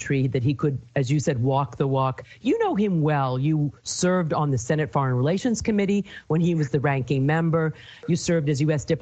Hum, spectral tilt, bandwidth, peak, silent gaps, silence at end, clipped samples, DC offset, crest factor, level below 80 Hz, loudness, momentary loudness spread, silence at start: none; -6.5 dB/octave; 9 kHz; -10 dBFS; none; 0 s; under 0.1%; under 0.1%; 14 dB; -52 dBFS; -24 LUFS; 4 LU; 0 s